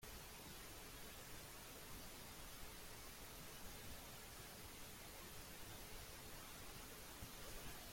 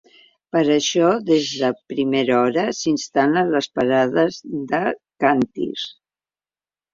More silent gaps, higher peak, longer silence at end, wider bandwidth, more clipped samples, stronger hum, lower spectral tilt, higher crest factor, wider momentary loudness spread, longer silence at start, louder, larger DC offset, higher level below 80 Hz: neither; second, -40 dBFS vs -2 dBFS; second, 0 s vs 1.05 s; first, 16.5 kHz vs 7.6 kHz; neither; neither; second, -2.5 dB/octave vs -4.5 dB/octave; about the same, 14 dB vs 18 dB; second, 1 LU vs 7 LU; second, 0 s vs 0.55 s; second, -55 LUFS vs -20 LUFS; neither; about the same, -64 dBFS vs -62 dBFS